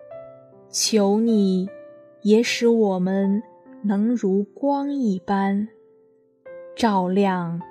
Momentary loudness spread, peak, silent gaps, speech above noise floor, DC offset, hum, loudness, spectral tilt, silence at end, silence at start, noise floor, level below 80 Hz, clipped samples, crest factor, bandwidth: 11 LU; -4 dBFS; none; 37 dB; under 0.1%; none; -21 LUFS; -5.5 dB/octave; 0 s; 0 s; -58 dBFS; -68 dBFS; under 0.1%; 18 dB; 13.5 kHz